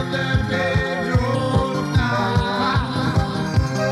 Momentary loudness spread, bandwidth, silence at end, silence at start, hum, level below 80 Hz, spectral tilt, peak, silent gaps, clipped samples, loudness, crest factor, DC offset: 1 LU; 13 kHz; 0 s; 0 s; none; -32 dBFS; -6.5 dB/octave; -6 dBFS; none; under 0.1%; -20 LUFS; 14 dB; under 0.1%